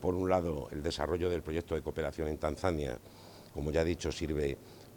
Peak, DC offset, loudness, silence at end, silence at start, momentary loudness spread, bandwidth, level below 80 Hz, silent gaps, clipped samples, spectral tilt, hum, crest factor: -14 dBFS; under 0.1%; -35 LUFS; 0 s; 0 s; 12 LU; 19 kHz; -50 dBFS; none; under 0.1%; -6 dB/octave; none; 20 dB